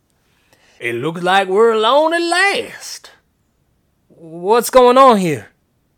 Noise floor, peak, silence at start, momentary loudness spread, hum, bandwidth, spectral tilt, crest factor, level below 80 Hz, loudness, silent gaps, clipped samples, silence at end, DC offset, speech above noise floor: -62 dBFS; 0 dBFS; 0.8 s; 17 LU; none; 18.5 kHz; -4 dB/octave; 16 dB; -52 dBFS; -13 LUFS; none; under 0.1%; 0.55 s; under 0.1%; 49 dB